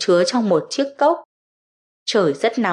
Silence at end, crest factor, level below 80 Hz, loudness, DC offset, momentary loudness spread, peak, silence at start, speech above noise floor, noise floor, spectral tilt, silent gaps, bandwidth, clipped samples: 0 s; 14 dB; -78 dBFS; -19 LUFS; under 0.1%; 8 LU; -6 dBFS; 0 s; over 72 dB; under -90 dBFS; -4.5 dB/octave; 1.25-2.06 s; 11 kHz; under 0.1%